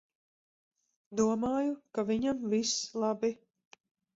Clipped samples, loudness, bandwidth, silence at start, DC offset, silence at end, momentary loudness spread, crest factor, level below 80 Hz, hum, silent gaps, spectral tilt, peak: under 0.1%; -32 LUFS; 7.8 kHz; 1.1 s; under 0.1%; 0.8 s; 6 LU; 18 dB; -70 dBFS; none; none; -4 dB/octave; -16 dBFS